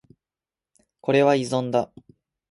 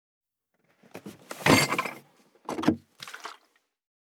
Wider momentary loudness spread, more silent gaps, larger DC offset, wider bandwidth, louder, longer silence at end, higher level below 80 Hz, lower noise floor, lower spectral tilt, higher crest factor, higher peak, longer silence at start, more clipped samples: second, 13 LU vs 24 LU; neither; neither; second, 11.5 kHz vs over 20 kHz; first, -22 LUFS vs -26 LUFS; about the same, 0.65 s vs 0.7 s; about the same, -66 dBFS vs -62 dBFS; first, under -90 dBFS vs -73 dBFS; first, -6 dB/octave vs -4 dB/octave; second, 18 dB vs 26 dB; about the same, -6 dBFS vs -6 dBFS; about the same, 1.05 s vs 0.95 s; neither